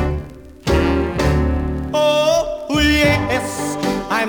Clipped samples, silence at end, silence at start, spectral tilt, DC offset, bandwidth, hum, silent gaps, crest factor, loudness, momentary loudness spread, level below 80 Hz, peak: under 0.1%; 0 s; 0 s; -5 dB/octave; under 0.1%; over 20 kHz; none; none; 16 dB; -17 LUFS; 9 LU; -28 dBFS; -2 dBFS